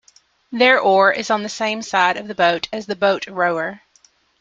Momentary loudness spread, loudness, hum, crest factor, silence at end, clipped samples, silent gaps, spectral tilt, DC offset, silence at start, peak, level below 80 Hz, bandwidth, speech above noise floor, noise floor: 11 LU; -18 LUFS; none; 18 dB; 0.65 s; under 0.1%; none; -3.5 dB/octave; under 0.1%; 0.5 s; 0 dBFS; -64 dBFS; 7.8 kHz; 39 dB; -57 dBFS